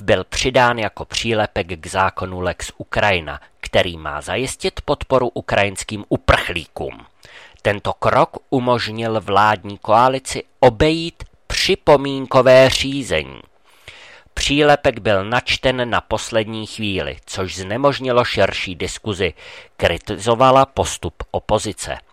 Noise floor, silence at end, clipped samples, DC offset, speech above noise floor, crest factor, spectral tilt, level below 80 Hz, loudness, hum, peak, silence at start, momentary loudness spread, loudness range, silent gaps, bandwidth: -44 dBFS; 0.1 s; under 0.1%; 0.2%; 26 dB; 16 dB; -4.5 dB/octave; -38 dBFS; -18 LUFS; none; -2 dBFS; 0 s; 12 LU; 5 LU; none; 15.5 kHz